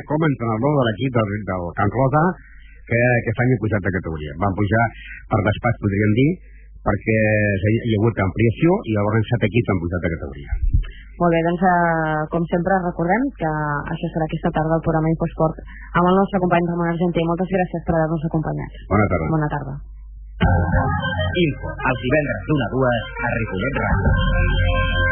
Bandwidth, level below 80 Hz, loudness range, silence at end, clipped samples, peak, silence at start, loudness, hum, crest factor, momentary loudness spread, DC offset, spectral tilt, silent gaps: 3.5 kHz; -30 dBFS; 2 LU; 0 s; under 0.1%; -4 dBFS; 0 s; -20 LUFS; none; 16 dB; 7 LU; under 0.1%; -11.5 dB/octave; none